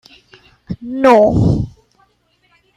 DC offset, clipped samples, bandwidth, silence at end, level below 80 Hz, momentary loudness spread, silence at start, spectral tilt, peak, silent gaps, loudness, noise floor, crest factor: under 0.1%; under 0.1%; 12 kHz; 1.05 s; -34 dBFS; 19 LU; 0.7 s; -8 dB/octave; -2 dBFS; none; -13 LUFS; -59 dBFS; 16 dB